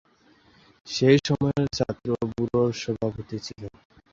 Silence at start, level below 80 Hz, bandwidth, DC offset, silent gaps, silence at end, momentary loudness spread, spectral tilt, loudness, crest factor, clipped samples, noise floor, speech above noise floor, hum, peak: 0.85 s; -52 dBFS; 7.8 kHz; under 0.1%; none; 0.45 s; 15 LU; -6 dB/octave; -25 LUFS; 20 dB; under 0.1%; -59 dBFS; 34 dB; none; -6 dBFS